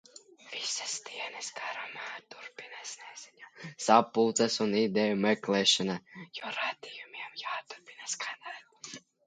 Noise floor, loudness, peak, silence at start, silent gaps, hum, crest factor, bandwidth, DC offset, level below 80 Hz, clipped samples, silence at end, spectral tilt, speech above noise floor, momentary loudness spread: -51 dBFS; -30 LUFS; -6 dBFS; 0.45 s; none; none; 26 dB; 9.6 kHz; under 0.1%; -78 dBFS; under 0.1%; 0.25 s; -3 dB/octave; 19 dB; 21 LU